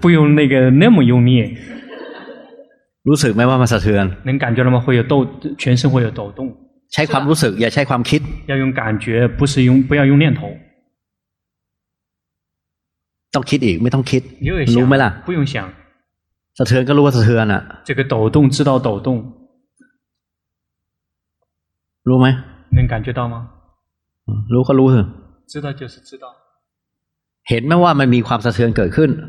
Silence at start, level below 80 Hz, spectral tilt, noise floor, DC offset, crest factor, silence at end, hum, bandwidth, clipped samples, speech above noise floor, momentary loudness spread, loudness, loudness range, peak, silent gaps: 0 s; -38 dBFS; -7 dB/octave; -80 dBFS; under 0.1%; 16 dB; 0 s; none; 13 kHz; under 0.1%; 67 dB; 15 LU; -15 LUFS; 6 LU; 0 dBFS; none